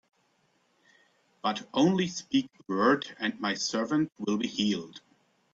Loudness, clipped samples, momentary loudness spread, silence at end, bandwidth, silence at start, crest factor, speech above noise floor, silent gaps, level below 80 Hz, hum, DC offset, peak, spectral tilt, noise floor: -29 LUFS; under 0.1%; 8 LU; 0.55 s; 7.8 kHz; 1.45 s; 20 dB; 42 dB; none; -70 dBFS; none; under 0.1%; -10 dBFS; -4.5 dB/octave; -71 dBFS